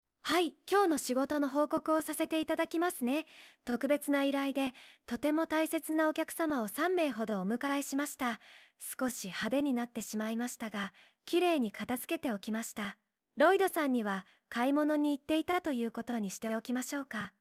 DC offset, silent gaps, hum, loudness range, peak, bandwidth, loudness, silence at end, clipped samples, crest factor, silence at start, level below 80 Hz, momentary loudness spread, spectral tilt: under 0.1%; none; none; 4 LU; -16 dBFS; 16 kHz; -33 LUFS; 0.1 s; under 0.1%; 18 dB; 0.25 s; -72 dBFS; 9 LU; -4 dB/octave